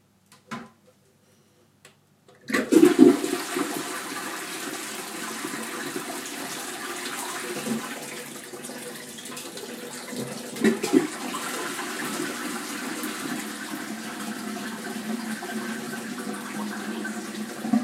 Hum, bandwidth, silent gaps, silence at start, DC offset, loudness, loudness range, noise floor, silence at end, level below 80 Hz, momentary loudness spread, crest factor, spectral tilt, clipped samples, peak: none; 16 kHz; none; 0.3 s; under 0.1%; -28 LUFS; 10 LU; -60 dBFS; 0 s; -74 dBFS; 13 LU; 28 dB; -3.5 dB/octave; under 0.1%; 0 dBFS